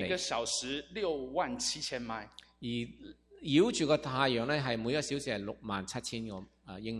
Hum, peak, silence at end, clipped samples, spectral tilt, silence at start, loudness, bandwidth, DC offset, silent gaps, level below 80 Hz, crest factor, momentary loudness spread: none; -12 dBFS; 0 s; under 0.1%; -4 dB/octave; 0 s; -33 LUFS; 14.5 kHz; under 0.1%; none; -62 dBFS; 22 dB; 16 LU